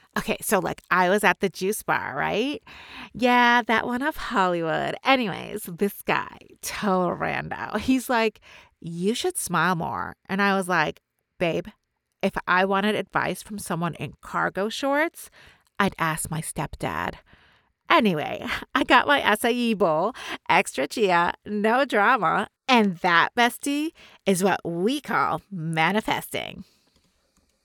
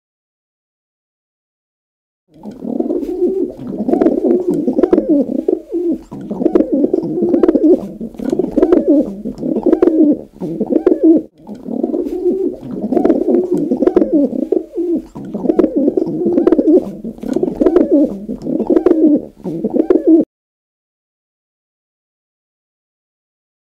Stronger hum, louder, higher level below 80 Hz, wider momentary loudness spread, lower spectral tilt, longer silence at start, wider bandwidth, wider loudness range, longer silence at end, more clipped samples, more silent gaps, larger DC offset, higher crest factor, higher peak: neither; second, -24 LUFS vs -14 LUFS; second, -54 dBFS vs -46 dBFS; about the same, 11 LU vs 12 LU; second, -4 dB/octave vs -9.5 dB/octave; second, 0.15 s vs 2.45 s; first, over 20 kHz vs 5.6 kHz; about the same, 5 LU vs 5 LU; second, 1.05 s vs 3.5 s; neither; neither; neither; first, 22 dB vs 14 dB; second, -4 dBFS vs 0 dBFS